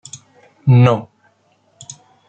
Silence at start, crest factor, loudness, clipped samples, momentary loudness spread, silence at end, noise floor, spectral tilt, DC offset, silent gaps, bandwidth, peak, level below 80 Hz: 0.15 s; 16 dB; -14 LUFS; under 0.1%; 25 LU; 1.25 s; -58 dBFS; -7.5 dB/octave; under 0.1%; none; 8.6 kHz; -2 dBFS; -52 dBFS